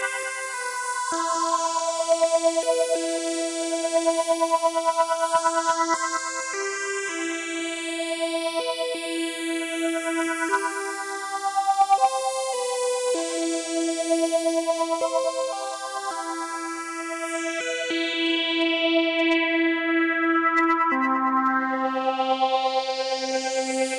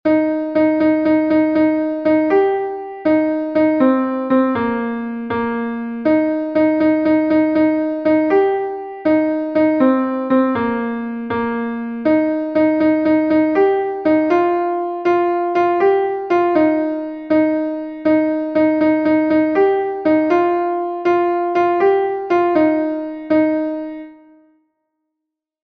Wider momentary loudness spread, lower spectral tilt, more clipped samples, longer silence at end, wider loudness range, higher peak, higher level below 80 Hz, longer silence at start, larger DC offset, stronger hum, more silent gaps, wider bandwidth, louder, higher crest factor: about the same, 8 LU vs 7 LU; second, 0 dB/octave vs -8 dB/octave; neither; second, 0 s vs 1.5 s; first, 5 LU vs 2 LU; second, -10 dBFS vs -2 dBFS; second, -74 dBFS vs -56 dBFS; about the same, 0 s vs 0.05 s; neither; neither; neither; first, 11.5 kHz vs 5.2 kHz; second, -24 LUFS vs -17 LUFS; about the same, 16 dB vs 14 dB